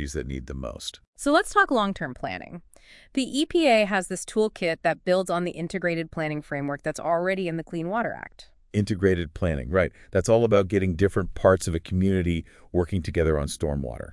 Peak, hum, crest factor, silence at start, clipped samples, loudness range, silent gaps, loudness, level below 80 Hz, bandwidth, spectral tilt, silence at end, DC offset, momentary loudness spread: -6 dBFS; none; 20 dB; 0 s; under 0.1%; 4 LU; 1.07-1.13 s; -25 LUFS; -44 dBFS; 12 kHz; -5.5 dB/octave; 0.1 s; under 0.1%; 12 LU